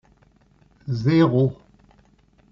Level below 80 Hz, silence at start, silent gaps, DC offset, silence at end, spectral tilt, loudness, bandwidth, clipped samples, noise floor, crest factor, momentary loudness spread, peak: -56 dBFS; 0.85 s; none; under 0.1%; 1 s; -7.5 dB/octave; -20 LUFS; 7 kHz; under 0.1%; -58 dBFS; 18 dB; 14 LU; -6 dBFS